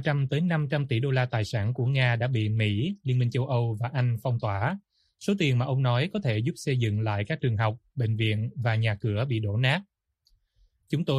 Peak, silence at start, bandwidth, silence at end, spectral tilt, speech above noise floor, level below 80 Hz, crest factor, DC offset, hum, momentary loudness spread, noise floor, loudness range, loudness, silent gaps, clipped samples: -10 dBFS; 0 s; 11 kHz; 0 s; -7 dB/octave; 43 dB; -60 dBFS; 16 dB; under 0.1%; none; 5 LU; -69 dBFS; 2 LU; -27 LUFS; none; under 0.1%